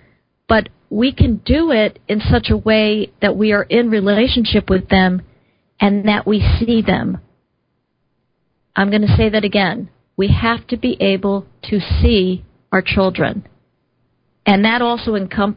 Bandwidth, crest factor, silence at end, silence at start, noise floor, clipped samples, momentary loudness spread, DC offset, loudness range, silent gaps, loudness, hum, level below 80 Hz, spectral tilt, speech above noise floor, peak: 5.2 kHz; 16 dB; 0 s; 0.5 s; -67 dBFS; under 0.1%; 7 LU; under 0.1%; 4 LU; none; -16 LUFS; none; -28 dBFS; -10.5 dB/octave; 53 dB; 0 dBFS